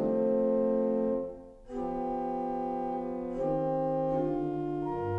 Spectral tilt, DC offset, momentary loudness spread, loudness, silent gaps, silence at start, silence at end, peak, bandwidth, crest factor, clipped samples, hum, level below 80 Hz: -10 dB/octave; under 0.1%; 8 LU; -31 LUFS; none; 0 s; 0 s; -18 dBFS; 5.2 kHz; 12 dB; under 0.1%; none; -54 dBFS